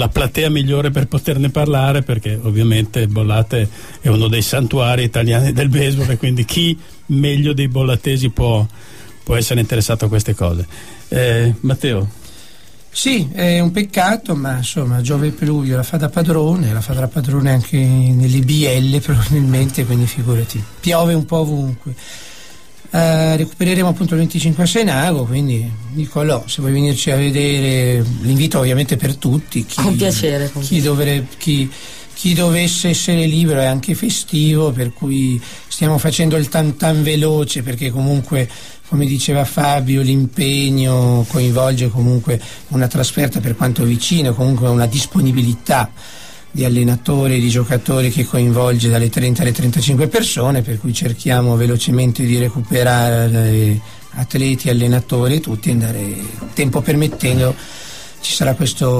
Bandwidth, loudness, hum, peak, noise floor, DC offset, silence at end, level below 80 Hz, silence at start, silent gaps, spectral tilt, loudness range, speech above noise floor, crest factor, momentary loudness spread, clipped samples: 15.5 kHz; -15 LUFS; none; -2 dBFS; -44 dBFS; 2%; 0 s; -36 dBFS; 0 s; none; -5.5 dB/octave; 3 LU; 29 dB; 12 dB; 6 LU; under 0.1%